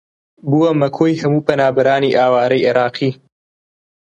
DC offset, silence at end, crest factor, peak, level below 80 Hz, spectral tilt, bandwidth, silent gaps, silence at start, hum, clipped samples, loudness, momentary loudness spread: under 0.1%; 0.9 s; 16 dB; 0 dBFS; -58 dBFS; -7.5 dB/octave; 8.8 kHz; none; 0.45 s; none; under 0.1%; -15 LUFS; 5 LU